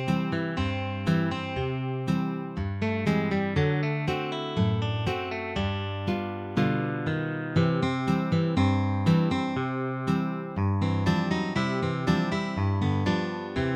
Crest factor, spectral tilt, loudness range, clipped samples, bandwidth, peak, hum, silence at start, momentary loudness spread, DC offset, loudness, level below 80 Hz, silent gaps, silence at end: 16 dB; -7.5 dB/octave; 3 LU; under 0.1%; 9.2 kHz; -10 dBFS; none; 0 s; 6 LU; under 0.1%; -27 LUFS; -50 dBFS; none; 0 s